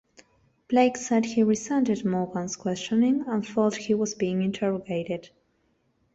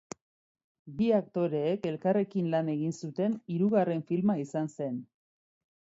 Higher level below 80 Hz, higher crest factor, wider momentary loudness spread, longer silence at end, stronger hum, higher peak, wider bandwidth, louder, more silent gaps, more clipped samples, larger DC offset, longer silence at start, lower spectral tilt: first, -64 dBFS vs -72 dBFS; about the same, 18 dB vs 18 dB; about the same, 8 LU vs 9 LU; about the same, 0.9 s vs 0.9 s; neither; first, -8 dBFS vs -14 dBFS; about the same, 8 kHz vs 8 kHz; first, -26 LUFS vs -30 LUFS; neither; neither; neither; second, 0.7 s vs 0.85 s; second, -5.5 dB/octave vs -8 dB/octave